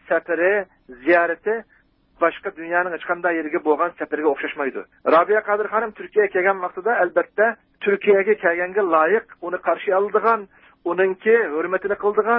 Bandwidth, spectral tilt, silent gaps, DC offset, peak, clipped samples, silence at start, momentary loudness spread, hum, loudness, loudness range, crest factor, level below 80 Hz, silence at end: 4.5 kHz; -10 dB/octave; none; under 0.1%; -4 dBFS; under 0.1%; 0.1 s; 8 LU; none; -20 LUFS; 3 LU; 16 dB; -64 dBFS; 0 s